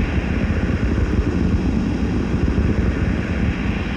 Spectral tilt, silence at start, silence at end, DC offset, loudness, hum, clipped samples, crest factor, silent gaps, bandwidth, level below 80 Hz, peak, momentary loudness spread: -8 dB/octave; 0 s; 0 s; under 0.1%; -20 LUFS; none; under 0.1%; 14 dB; none; 8.4 kHz; -24 dBFS; -6 dBFS; 2 LU